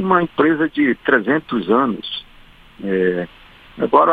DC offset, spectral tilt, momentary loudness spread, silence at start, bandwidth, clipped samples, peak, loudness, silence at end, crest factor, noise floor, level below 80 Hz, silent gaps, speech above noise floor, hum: under 0.1%; -8 dB/octave; 12 LU; 0 s; 4.9 kHz; under 0.1%; 0 dBFS; -18 LUFS; 0 s; 18 dB; -45 dBFS; -52 dBFS; none; 28 dB; none